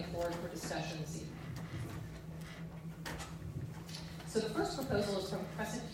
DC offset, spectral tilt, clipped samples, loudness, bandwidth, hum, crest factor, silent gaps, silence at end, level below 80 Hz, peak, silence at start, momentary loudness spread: under 0.1%; -5 dB/octave; under 0.1%; -41 LUFS; 16 kHz; none; 18 dB; none; 0 s; -58 dBFS; -22 dBFS; 0 s; 11 LU